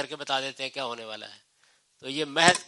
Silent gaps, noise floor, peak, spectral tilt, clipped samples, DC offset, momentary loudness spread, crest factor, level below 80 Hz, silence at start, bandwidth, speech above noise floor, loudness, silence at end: none; -66 dBFS; -2 dBFS; -2 dB/octave; under 0.1%; under 0.1%; 20 LU; 26 dB; -76 dBFS; 0 s; 11.5 kHz; 38 dB; -28 LUFS; 0 s